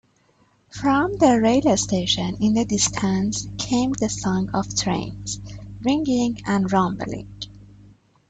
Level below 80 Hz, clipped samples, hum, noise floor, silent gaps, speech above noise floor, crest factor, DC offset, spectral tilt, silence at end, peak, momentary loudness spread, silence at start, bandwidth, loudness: -46 dBFS; under 0.1%; 50 Hz at -35 dBFS; -60 dBFS; none; 39 dB; 18 dB; under 0.1%; -4.5 dB/octave; 0.65 s; -4 dBFS; 14 LU; 0.75 s; 9.2 kHz; -21 LUFS